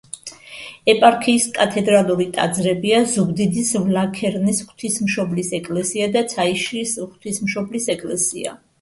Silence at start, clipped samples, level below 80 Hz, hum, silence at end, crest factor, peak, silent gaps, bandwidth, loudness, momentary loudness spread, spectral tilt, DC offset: 0.15 s; under 0.1%; -58 dBFS; none; 0.25 s; 20 dB; 0 dBFS; none; 12 kHz; -19 LUFS; 10 LU; -4 dB/octave; under 0.1%